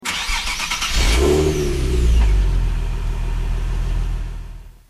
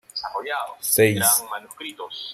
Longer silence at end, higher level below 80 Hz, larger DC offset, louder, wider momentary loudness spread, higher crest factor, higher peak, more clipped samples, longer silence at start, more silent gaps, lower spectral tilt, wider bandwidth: first, 0.2 s vs 0 s; first, -20 dBFS vs -66 dBFS; neither; about the same, -20 LUFS vs -20 LUFS; second, 10 LU vs 18 LU; second, 12 dB vs 20 dB; about the same, -6 dBFS vs -4 dBFS; neither; second, 0 s vs 0.15 s; neither; first, -4.5 dB/octave vs -2.5 dB/octave; second, 13.5 kHz vs 15.5 kHz